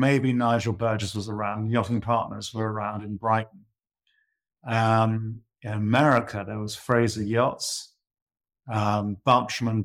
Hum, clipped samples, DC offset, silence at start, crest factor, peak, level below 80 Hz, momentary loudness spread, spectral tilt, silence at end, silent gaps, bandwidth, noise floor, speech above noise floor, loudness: none; under 0.1%; under 0.1%; 0 s; 18 dB; -8 dBFS; -60 dBFS; 11 LU; -6 dB/octave; 0 s; 8.22-8.26 s; 14 kHz; -74 dBFS; 49 dB; -25 LUFS